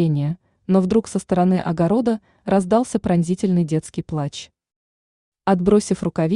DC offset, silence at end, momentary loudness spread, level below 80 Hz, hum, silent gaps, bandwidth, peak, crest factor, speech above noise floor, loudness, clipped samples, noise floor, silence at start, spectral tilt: under 0.1%; 0 s; 9 LU; -50 dBFS; none; 4.76-5.32 s; 11 kHz; -4 dBFS; 16 dB; over 71 dB; -20 LUFS; under 0.1%; under -90 dBFS; 0 s; -7.5 dB/octave